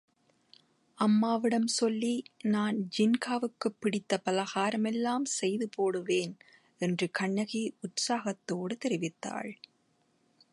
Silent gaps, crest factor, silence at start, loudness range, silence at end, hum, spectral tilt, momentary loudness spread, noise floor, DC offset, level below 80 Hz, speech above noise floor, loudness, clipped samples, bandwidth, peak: none; 20 dB; 1 s; 4 LU; 1 s; none; -4.5 dB/octave; 8 LU; -72 dBFS; under 0.1%; -80 dBFS; 41 dB; -31 LUFS; under 0.1%; 11.5 kHz; -12 dBFS